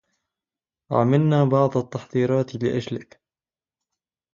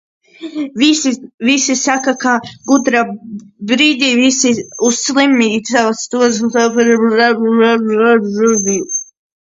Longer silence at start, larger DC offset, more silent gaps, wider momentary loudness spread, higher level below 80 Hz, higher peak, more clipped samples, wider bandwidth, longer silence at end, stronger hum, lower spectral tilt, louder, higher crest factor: first, 0.9 s vs 0.4 s; neither; second, none vs 1.34-1.38 s; about the same, 9 LU vs 9 LU; about the same, -62 dBFS vs -58 dBFS; second, -4 dBFS vs 0 dBFS; neither; about the same, 7.4 kHz vs 7.8 kHz; first, 1.3 s vs 0.5 s; neither; first, -8.5 dB/octave vs -2.5 dB/octave; second, -22 LUFS vs -13 LUFS; about the same, 18 dB vs 14 dB